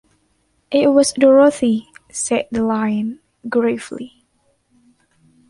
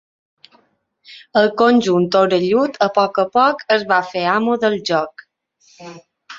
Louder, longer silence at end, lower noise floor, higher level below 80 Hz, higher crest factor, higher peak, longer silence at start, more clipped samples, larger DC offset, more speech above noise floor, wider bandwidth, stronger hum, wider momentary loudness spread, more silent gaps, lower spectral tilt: about the same, -16 LUFS vs -16 LUFS; first, 1.4 s vs 0 s; about the same, -63 dBFS vs -60 dBFS; first, -56 dBFS vs -62 dBFS; about the same, 18 dB vs 16 dB; about the same, -2 dBFS vs -2 dBFS; second, 0.7 s vs 1.1 s; neither; neither; first, 48 dB vs 44 dB; first, 11.5 kHz vs 7.8 kHz; neither; first, 19 LU vs 6 LU; neither; about the same, -4.5 dB/octave vs -5.5 dB/octave